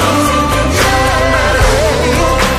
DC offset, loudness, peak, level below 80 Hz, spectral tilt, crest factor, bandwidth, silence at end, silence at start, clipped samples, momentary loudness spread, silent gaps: under 0.1%; -11 LUFS; 0 dBFS; -18 dBFS; -4 dB/octave; 10 dB; 15.5 kHz; 0 s; 0 s; under 0.1%; 1 LU; none